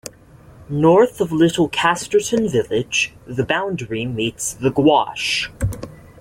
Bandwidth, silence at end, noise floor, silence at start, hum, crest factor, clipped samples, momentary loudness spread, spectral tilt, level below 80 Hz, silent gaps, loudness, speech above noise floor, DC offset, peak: 16.5 kHz; 0.2 s; -45 dBFS; 0.05 s; none; 16 dB; under 0.1%; 11 LU; -4.5 dB/octave; -42 dBFS; none; -18 LUFS; 27 dB; under 0.1%; -4 dBFS